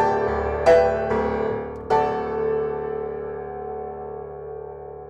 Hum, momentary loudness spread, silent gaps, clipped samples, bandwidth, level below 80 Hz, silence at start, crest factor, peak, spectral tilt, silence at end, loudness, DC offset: none; 17 LU; none; under 0.1%; 9.4 kHz; -42 dBFS; 0 s; 16 dB; -8 dBFS; -6.5 dB/octave; 0 s; -23 LUFS; under 0.1%